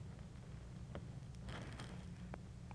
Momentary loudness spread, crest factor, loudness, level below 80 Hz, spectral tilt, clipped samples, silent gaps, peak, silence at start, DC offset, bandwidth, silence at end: 4 LU; 20 dB; -52 LUFS; -58 dBFS; -6 dB/octave; under 0.1%; none; -30 dBFS; 0 s; under 0.1%; 11 kHz; 0 s